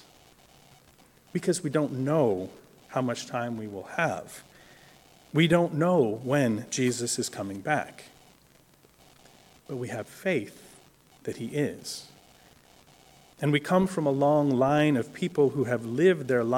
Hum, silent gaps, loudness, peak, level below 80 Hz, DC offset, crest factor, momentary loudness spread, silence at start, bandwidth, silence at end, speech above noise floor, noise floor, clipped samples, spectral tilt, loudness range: none; none; -27 LUFS; -8 dBFS; -66 dBFS; under 0.1%; 20 dB; 14 LU; 1.35 s; 17.5 kHz; 0 s; 33 dB; -59 dBFS; under 0.1%; -5.5 dB/octave; 10 LU